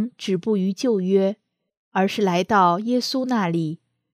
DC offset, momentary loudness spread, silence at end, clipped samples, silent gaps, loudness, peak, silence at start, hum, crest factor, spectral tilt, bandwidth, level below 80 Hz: under 0.1%; 9 LU; 0.4 s; under 0.1%; 1.77-1.92 s; -21 LUFS; -6 dBFS; 0 s; none; 16 dB; -6 dB/octave; 14.5 kHz; -66 dBFS